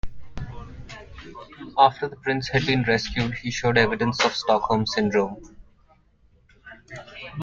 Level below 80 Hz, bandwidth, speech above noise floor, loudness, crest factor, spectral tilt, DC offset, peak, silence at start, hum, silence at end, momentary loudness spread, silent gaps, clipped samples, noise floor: -44 dBFS; 7.6 kHz; 36 dB; -22 LUFS; 22 dB; -5 dB/octave; under 0.1%; -2 dBFS; 0.05 s; none; 0 s; 22 LU; none; under 0.1%; -59 dBFS